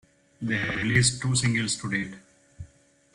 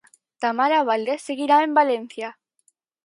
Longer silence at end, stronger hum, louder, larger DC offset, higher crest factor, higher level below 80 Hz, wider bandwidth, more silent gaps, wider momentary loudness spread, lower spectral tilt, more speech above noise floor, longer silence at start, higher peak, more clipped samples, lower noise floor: second, 0.5 s vs 0.75 s; neither; second, -25 LUFS vs -21 LUFS; neither; about the same, 20 dB vs 18 dB; first, -52 dBFS vs -80 dBFS; about the same, 11.5 kHz vs 11.5 kHz; neither; second, 9 LU vs 15 LU; about the same, -3.5 dB/octave vs -3.5 dB/octave; second, 33 dB vs 46 dB; about the same, 0.4 s vs 0.4 s; second, -8 dBFS vs -4 dBFS; neither; second, -58 dBFS vs -67 dBFS